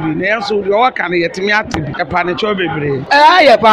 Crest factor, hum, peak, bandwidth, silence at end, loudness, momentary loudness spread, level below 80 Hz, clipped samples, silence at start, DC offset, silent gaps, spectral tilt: 12 dB; none; 0 dBFS; 13.5 kHz; 0 s; -12 LUFS; 10 LU; -44 dBFS; under 0.1%; 0 s; under 0.1%; none; -5 dB/octave